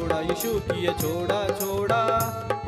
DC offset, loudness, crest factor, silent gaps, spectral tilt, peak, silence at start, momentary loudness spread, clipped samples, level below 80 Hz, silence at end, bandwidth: under 0.1%; -25 LUFS; 16 dB; none; -5 dB/octave; -10 dBFS; 0 s; 4 LU; under 0.1%; -46 dBFS; 0 s; 16 kHz